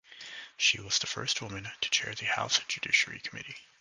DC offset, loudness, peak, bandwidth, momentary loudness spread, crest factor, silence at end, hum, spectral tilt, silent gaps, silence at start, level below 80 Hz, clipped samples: under 0.1%; -29 LUFS; -10 dBFS; 11 kHz; 16 LU; 22 dB; 0.2 s; none; -0.5 dB/octave; none; 0.1 s; -66 dBFS; under 0.1%